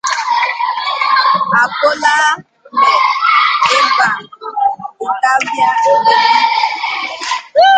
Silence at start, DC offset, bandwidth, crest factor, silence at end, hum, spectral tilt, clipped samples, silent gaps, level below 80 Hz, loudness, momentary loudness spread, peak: 0.05 s; under 0.1%; 9.4 kHz; 12 dB; 0 s; none; -1 dB/octave; under 0.1%; none; -62 dBFS; -12 LUFS; 9 LU; 0 dBFS